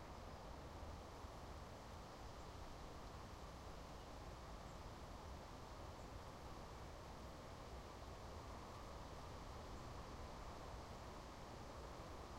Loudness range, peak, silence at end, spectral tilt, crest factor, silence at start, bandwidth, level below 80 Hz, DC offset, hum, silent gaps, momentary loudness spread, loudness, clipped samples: 1 LU; -42 dBFS; 0 s; -5 dB/octave; 14 dB; 0 s; 16 kHz; -60 dBFS; under 0.1%; none; none; 1 LU; -56 LUFS; under 0.1%